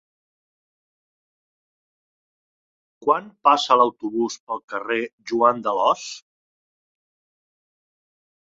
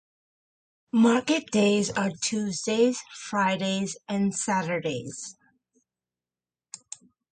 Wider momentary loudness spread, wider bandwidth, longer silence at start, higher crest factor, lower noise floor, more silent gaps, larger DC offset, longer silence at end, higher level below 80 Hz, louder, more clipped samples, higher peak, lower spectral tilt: second, 12 LU vs 19 LU; second, 7.8 kHz vs 9.4 kHz; first, 3 s vs 0.95 s; first, 24 dB vs 18 dB; about the same, under -90 dBFS vs under -90 dBFS; first, 4.40-4.47 s, 4.64-4.68 s, 5.13-5.18 s vs none; neither; first, 2.3 s vs 2 s; about the same, -72 dBFS vs -68 dBFS; first, -21 LUFS vs -26 LUFS; neither; first, -2 dBFS vs -10 dBFS; about the same, -3.5 dB/octave vs -4.5 dB/octave